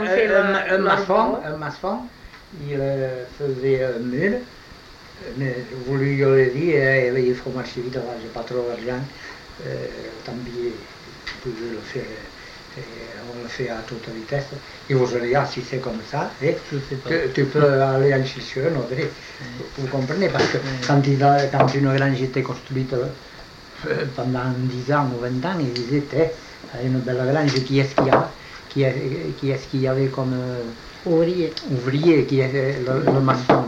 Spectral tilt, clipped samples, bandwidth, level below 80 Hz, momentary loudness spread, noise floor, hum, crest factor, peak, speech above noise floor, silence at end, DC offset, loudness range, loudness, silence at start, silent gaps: -7 dB/octave; under 0.1%; 8.2 kHz; -50 dBFS; 17 LU; -43 dBFS; none; 18 dB; -4 dBFS; 22 dB; 0 s; under 0.1%; 11 LU; -22 LUFS; 0 s; none